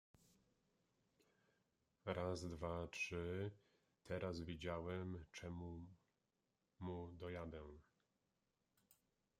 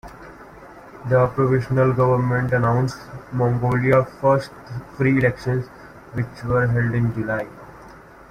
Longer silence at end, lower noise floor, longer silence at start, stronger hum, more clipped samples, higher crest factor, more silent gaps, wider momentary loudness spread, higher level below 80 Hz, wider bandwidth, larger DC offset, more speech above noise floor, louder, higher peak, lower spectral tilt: first, 0.45 s vs 0.3 s; first, -89 dBFS vs -43 dBFS; first, 2.05 s vs 0.05 s; neither; neither; first, 22 dB vs 16 dB; neither; second, 9 LU vs 17 LU; second, -70 dBFS vs -46 dBFS; first, 15 kHz vs 9.8 kHz; neither; first, 41 dB vs 24 dB; second, -49 LUFS vs -20 LUFS; second, -28 dBFS vs -4 dBFS; second, -6 dB/octave vs -8.5 dB/octave